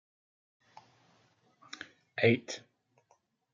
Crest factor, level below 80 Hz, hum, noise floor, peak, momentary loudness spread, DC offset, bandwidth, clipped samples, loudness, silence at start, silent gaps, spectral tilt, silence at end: 26 dB; -80 dBFS; none; -72 dBFS; -12 dBFS; 20 LU; under 0.1%; 7.6 kHz; under 0.1%; -31 LUFS; 2.15 s; none; -5.5 dB/octave; 0.95 s